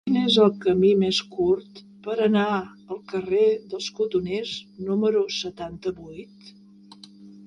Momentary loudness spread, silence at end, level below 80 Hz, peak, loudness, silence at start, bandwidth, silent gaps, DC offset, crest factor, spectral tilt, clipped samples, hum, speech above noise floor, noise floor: 14 LU; 0 s; -60 dBFS; -4 dBFS; -23 LUFS; 0.05 s; 10.5 kHz; none; under 0.1%; 20 dB; -5.5 dB/octave; under 0.1%; none; 25 dB; -48 dBFS